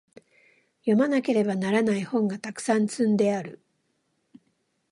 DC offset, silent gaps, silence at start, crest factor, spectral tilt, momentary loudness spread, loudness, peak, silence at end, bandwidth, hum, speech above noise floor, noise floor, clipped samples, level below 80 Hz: under 0.1%; none; 0.85 s; 18 dB; -6 dB/octave; 9 LU; -25 LUFS; -8 dBFS; 1.35 s; 11.5 kHz; none; 49 dB; -73 dBFS; under 0.1%; -74 dBFS